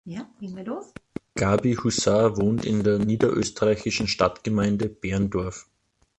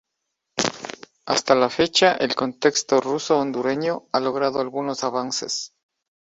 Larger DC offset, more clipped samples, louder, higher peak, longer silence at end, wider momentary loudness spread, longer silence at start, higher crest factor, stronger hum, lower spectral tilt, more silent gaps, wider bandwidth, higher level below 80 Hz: neither; neither; about the same, -24 LUFS vs -22 LUFS; second, -4 dBFS vs 0 dBFS; about the same, 0.55 s vs 0.55 s; first, 15 LU vs 10 LU; second, 0.05 s vs 0.55 s; about the same, 20 dB vs 22 dB; neither; first, -5.5 dB/octave vs -3 dB/octave; neither; about the same, 8.8 kHz vs 8.2 kHz; first, -46 dBFS vs -62 dBFS